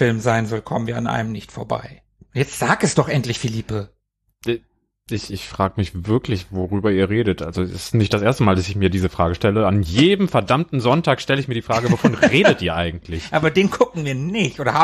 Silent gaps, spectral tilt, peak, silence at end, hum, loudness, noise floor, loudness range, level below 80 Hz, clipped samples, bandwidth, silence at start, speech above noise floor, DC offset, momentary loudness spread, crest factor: none; -6 dB/octave; -2 dBFS; 0 s; none; -19 LUFS; -57 dBFS; 6 LU; -42 dBFS; under 0.1%; 13.5 kHz; 0 s; 39 dB; under 0.1%; 12 LU; 18 dB